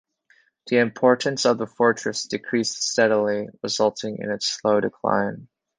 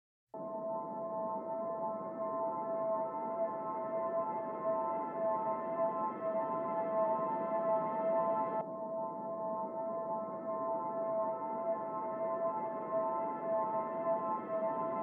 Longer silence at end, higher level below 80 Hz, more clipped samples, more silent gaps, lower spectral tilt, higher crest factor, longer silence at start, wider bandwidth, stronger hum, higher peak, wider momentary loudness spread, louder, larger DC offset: first, 0.35 s vs 0 s; first, -66 dBFS vs -88 dBFS; neither; neither; second, -3.5 dB/octave vs -8 dB/octave; first, 20 dB vs 14 dB; first, 0.65 s vs 0.35 s; first, 10 kHz vs 3.3 kHz; neither; first, -4 dBFS vs -22 dBFS; first, 9 LU vs 6 LU; first, -22 LUFS vs -37 LUFS; neither